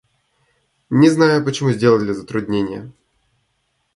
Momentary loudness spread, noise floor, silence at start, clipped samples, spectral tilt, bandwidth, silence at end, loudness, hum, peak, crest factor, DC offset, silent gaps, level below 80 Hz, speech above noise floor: 11 LU; -68 dBFS; 0.9 s; under 0.1%; -6.5 dB/octave; 11.5 kHz; 1.05 s; -17 LUFS; none; 0 dBFS; 18 dB; under 0.1%; none; -54 dBFS; 52 dB